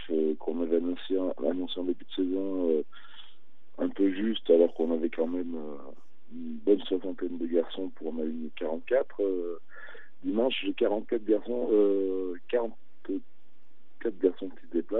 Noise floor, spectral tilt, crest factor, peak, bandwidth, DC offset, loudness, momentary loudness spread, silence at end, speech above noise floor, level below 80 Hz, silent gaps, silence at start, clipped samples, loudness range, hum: -69 dBFS; -8.5 dB/octave; 20 dB; -10 dBFS; 4.1 kHz; 2%; -30 LUFS; 14 LU; 0 s; 40 dB; -80 dBFS; none; 0 s; under 0.1%; 3 LU; none